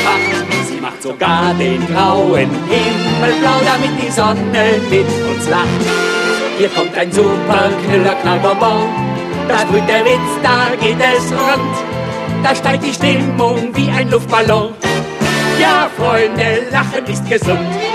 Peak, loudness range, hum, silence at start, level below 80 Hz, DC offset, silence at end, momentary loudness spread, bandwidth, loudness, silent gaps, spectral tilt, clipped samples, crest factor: 0 dBFS; 1 LU; none; 0 s; -44 dBFS; under 0.1%; 0 s; 5 LU; 14 kHz; -13 LUFS; none; -5 dB/octave; under 0.1%; 12 dB